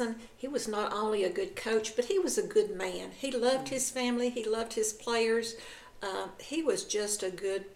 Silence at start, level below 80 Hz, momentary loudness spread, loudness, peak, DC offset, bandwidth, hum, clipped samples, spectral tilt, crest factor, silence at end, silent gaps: 0 s; -62 dBFS; 8 LU; -32 LUFS; -16 dBFS; under 0.1%; 16.5 kHz; none; under 0.1%; -2.5 dB/octave; 16 dB; 0 s; none